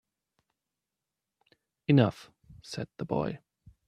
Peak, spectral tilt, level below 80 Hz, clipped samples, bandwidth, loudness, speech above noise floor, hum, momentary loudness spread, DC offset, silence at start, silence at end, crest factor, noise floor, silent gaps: -10 dBFS; -7.5 dB/octave; -64 dBFS; under 0.1%; 10.5 kHz; -29 LUFS; 60 dB; none; 19 LU; under 0.1%; 1.9 s; 0.5 s; 24 dB; -88 dBFS; none